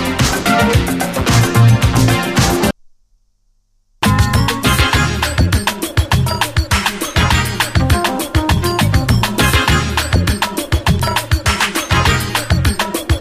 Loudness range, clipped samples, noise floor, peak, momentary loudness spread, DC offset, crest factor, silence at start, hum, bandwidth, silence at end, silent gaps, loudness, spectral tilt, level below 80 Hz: 2 LU; under 0.1%; -58 dBFS; 0 dBFS; 5 LU; under 0.1%; 14 dB; 0 s; 50 Hz at -35 dBFS; 15.5 kHz; 0 s; none; -14 LUFS; -4.5 dB/octave; -22 dBFS